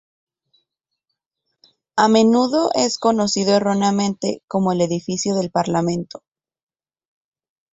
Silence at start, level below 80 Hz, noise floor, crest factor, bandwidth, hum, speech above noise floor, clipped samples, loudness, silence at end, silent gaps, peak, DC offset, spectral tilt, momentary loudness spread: 1.95 s; -60 dBFS; -79 dBFS; 18 dB; 8.2 kHz; none; 61 dB; under 0.1%; -18 LUFS; 1.55 s; 4.44-4.48 s; -2 dBFS; under 0.1%; -5 dB/octave; 9 LU